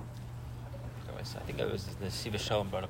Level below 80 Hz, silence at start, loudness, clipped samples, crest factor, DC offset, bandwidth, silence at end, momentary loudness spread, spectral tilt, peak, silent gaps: -50 dBFS; 0 s; -38 LUFS; under 0.1%; 18 dB; under 0.1%; 16 kHz; 0 s; 11 LU; -5 dB/octave; -20 dBFS; none